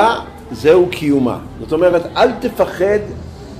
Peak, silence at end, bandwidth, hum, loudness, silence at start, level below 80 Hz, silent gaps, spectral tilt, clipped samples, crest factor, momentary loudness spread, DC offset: -2 dBFS; 0 s; 15.5 kHz; none; -15 LUFS; 0 s; -40 dBFS; none; -6 dB/octave; under 0.1%; 12 dB; 14 LU; under 0.1%